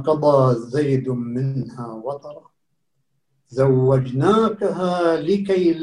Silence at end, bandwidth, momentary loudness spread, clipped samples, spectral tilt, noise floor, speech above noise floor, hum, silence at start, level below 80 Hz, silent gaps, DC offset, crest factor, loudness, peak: 0 s; 10 kHz; 14 LU; under 0.1%; -8.5 dB/octave; -74 dBFS; 56 dB; none; 0 s; -56 dBFS; none; under 0.1%; 16 dB; -19 LUFS; -2 dBFS